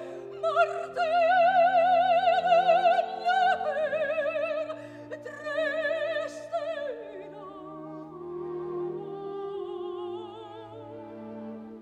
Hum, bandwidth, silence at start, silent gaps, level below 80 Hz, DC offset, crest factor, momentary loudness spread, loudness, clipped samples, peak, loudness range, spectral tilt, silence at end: none; 9 kHz; 0 s; none; -72 dBFS; under 0.1%; 16 dB; 20 LU; -27 LUFS; under 0.1%; -12 dBFS; 14 LU; -4.5 dB/octave; 0 s